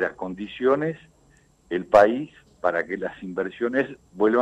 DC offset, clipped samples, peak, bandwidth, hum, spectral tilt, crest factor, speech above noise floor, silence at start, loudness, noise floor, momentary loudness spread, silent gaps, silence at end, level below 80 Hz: under 0.1%; under 0.1%; -4 dBFS; 10 kHz; none; -7 dB/octave; 20 dB; 35 dB; 0 s; -24 LUFS; -58 dBFS; 15 LU; none; 0 s; -58 dBFS